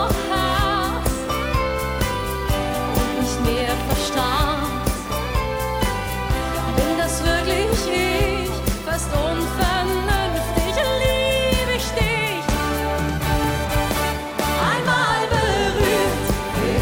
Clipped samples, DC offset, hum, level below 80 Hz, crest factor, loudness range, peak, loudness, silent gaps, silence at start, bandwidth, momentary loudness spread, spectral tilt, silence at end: under 0.1%; 0.1%; none; -28 dBFS; 16 dB; 2 LU; -4 dBFS; -21 LUFS; none; 0 s; 16.5 kHz; 5 LU; -4.5 dB/octave; 0 s